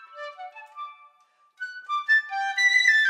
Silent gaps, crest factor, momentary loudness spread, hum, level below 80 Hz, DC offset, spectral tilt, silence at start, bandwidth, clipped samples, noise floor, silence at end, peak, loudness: none; 18 dB; 23 LU; none; under -90 dBFS; under 0.1%; 7 dB/octave; 0 s; 14.5 kHz; under 0.1%; -62 dBFS; 0 s; -6 dBFS; -21 LUFS